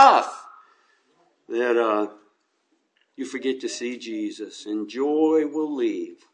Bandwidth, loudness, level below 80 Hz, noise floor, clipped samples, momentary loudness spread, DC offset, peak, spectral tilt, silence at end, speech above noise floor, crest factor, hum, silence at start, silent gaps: 10 kHz; -25 LUFS; under -90 dBFS; -70 dBFS; under 0.1%; 13 LU; under 0.1%; -2 dBFS; -3.5 dB/octave; 0.2 s; 45 dB; 22 dB; none; 0 s; none